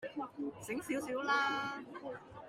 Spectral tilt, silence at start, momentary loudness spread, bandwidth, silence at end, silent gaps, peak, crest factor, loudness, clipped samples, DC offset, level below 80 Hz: -3.5 dB/octave; 0 s; 14 LU; 16 kHz; 0 s; none; -20 dBFS; 20 dB; -38 LUFS; under 0.1%; under 0.1%; -74 dBFS